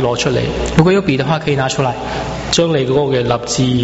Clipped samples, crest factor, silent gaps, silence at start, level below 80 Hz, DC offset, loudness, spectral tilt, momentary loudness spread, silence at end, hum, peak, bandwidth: under 0.1%; 14 dB; none; 0 s; -32 dBFS; under 0.1%; -15 LUFS; -5 dB/octave; 6 LU; 0 s; none; 0 dBFS; 8.2 kHz